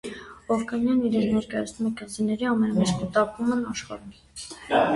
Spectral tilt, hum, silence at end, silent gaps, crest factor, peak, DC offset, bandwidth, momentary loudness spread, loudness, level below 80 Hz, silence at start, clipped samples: -5.5 dB/octave; none; 0 s; none; 16 dB; -8 dBFS; under 0.1%; 11.5 kHz; 16 LU; -25 LUFS; -54 dBFS; 0.05 s; under 0.1%